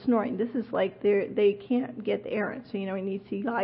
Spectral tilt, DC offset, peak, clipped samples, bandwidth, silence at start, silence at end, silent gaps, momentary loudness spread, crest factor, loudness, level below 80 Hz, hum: -10.5 dB/octave; under 0.1%; -14 dBFS; under 0.1%; 5.2 kHz; 0 s; 0 s; none; 8 LU; 14 dB; -29 LUFS; -68 dBFS; none